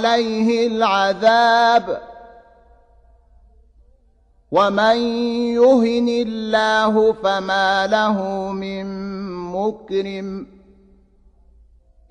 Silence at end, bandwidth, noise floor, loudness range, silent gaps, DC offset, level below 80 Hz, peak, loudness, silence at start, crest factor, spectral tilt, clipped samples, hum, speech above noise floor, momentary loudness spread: 1.65 s; 9.6 kHz; -56 dBFS; 10 LU; none; under 0.1%; -52 dBFS; -4 dBFS; -18 LUFS; 0 s; 16 dB; -5 dB/octave; under 0.1%; none; 39 dB; 14 LU